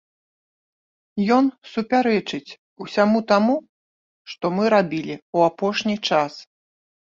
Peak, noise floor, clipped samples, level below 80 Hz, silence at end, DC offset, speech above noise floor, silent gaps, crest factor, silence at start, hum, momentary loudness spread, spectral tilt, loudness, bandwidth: -2 dBFS; under -90 dBFS; under 0.1%; -66 dBFS; 0.6 s; under 0.1%; over 70 dB; 2.58-2.76 s, 3.69-4.25 s, 5.22-5.33 s; 20 dB; 1.15 s; none; 13 LU; -6 dB/octave; -21 LUFS; 7.4 kHz